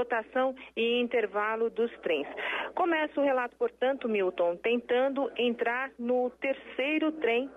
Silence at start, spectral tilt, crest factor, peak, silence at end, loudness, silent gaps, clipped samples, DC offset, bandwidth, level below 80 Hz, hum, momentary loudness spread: 0 s; -5.5 dB/octave; 12 dB; -18 dBFS; 0 s; -30 LUFS; none; under 0.1%; under 0.1%; 3.9 kHz; -70 dBFS; none; 4 LU